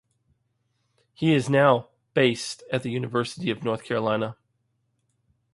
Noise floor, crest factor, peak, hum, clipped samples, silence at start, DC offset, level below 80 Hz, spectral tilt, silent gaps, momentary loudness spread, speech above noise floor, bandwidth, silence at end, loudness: -73 dBFS; 22 dB; -4 dBFS; none; under 0.1%; 1.2 s; under 0.1%; -66 dBFS; -5.5 dB/octave; none; 10 LU; 49 dB; 11.5 kHz; 1.2 s; -25 LUFS